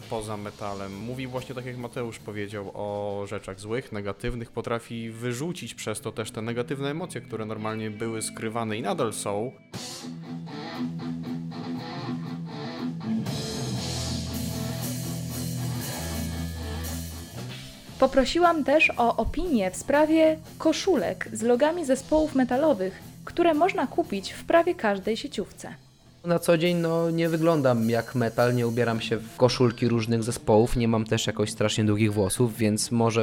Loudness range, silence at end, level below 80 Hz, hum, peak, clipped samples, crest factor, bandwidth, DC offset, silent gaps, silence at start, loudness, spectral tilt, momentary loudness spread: 10 LU; 0 s; -46 dBFS; none; -8 dBFS; under 0.1%; 18 dB; 17.5 kHz; under 0.1%; none; 0 s; -27 LUFS; -5.5 dB/octave; 13 LU